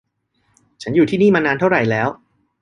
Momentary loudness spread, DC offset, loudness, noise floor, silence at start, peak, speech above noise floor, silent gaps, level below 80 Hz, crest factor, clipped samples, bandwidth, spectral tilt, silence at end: 8 LU; under 0.1%; -16 LUFS; -65 dBFS; 0.8 s; -2 dBFS; 50 dB; none; -54 dBFS; 16 dB; under 0.1%; 10 kHz; -7 dB/octave; 0.45 s